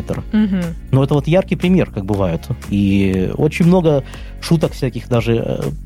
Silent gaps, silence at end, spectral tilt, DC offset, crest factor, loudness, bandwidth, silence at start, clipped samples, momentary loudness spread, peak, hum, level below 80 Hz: none; 0 s; -7.5 dB/octave; under 0.1%; 14 dB; -16 LUFS; 15 kHz; 0 s; under 0.1%; 8 LU; -2 dBFS; none; -32 dBFS